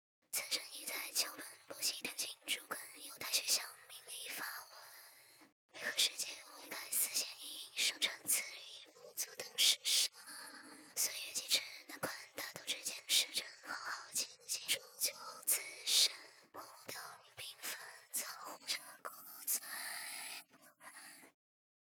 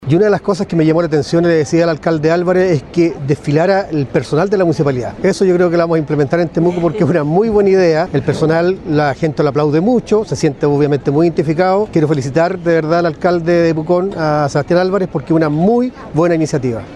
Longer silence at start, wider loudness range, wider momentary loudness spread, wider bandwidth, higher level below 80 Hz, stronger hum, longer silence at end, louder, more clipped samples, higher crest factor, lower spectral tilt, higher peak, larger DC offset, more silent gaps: first, 0.3 s vs 0 s; first, 7 LU vs 1 LU; first, 19 LU vs 4 LU; first, over 20 kHz vs 11 kHz; second, under -90 dBFS vs -42 dBFS; neither; first, 0.6 s vs 0 s; second, -38 LUFS vs -14 LUFS; neither; first, 26 dB vs 12 dB; second, 2 dB/octave vs -7.5 dB/octave; second, -16 dBFS vs 0 dBFS; neither; first, 5.52-5.69 s vs none